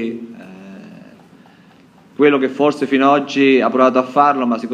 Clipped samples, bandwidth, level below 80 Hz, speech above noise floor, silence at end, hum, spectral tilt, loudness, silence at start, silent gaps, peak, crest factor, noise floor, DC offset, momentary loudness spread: under 0.1%; 9.4 kHz; -68 dBFS; 32 dB; 0 s; none; -6 dB/octave; -14 LUFS; 0 s; none; 0 dBFS; 16 dB; -47 dBFS; under 0.1%; 23 LU